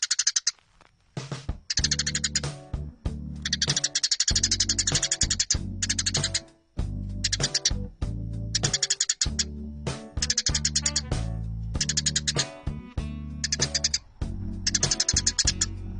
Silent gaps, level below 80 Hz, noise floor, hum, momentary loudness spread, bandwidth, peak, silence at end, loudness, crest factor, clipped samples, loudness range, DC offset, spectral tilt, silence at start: none; -38 dBFS; -60 dBFS; none; 13 LU; 10.5 kHz; -8 dBFS; 0 s; -25 LUFS; 20 dB; under 0.1%; 4 LU; under 0.1%; -1.5 dB/octave; 0 s